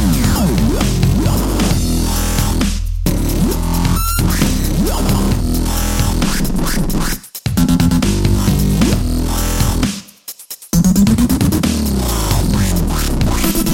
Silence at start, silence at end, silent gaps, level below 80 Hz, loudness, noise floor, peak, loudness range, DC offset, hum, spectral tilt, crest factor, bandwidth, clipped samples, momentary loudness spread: 0 s; 0 s; none; -18 dBFS; -15 LUFS; -34 dBFS; 0 dBFS; 1 LU; 0.8%; none; -5 dB/octave; 14 dB; 17 kHz; under 0.1%; 5 LU